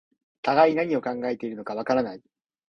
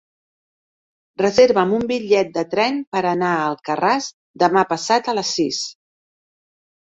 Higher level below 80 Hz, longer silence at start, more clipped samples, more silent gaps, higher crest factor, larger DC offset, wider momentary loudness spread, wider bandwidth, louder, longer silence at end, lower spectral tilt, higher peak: second, -68 dBFS vs -60 dBFS; second, 0.45 s vs 1.2 s; neither; second, none vs 2.87-2.92 s, 4.14-4.34 s; about the same, 20 dB vs 18 dB; neither; first, 12 LU vs 8 LU; second, 7 kHz vs 8 kHz; second, -25 LUFS vs -19 LUFS; second, 0.5 s vs 1.1 s; first, -6.5 dB/octave vs -4 dB/octave; second, -6 dBFS vs -2 dBFS